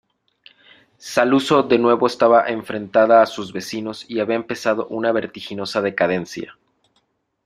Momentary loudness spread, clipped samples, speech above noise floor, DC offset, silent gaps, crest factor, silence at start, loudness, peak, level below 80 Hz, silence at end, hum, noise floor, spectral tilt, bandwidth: 14 LU; under 0.1%; 49 dB; under 0.1%; none; 18 dB; 1.05 s; -19 LUFS; -2 dBFS; -62 dBFS; 0.95 s; none; -67 dBFS; -5 dB/octave; 15 kHz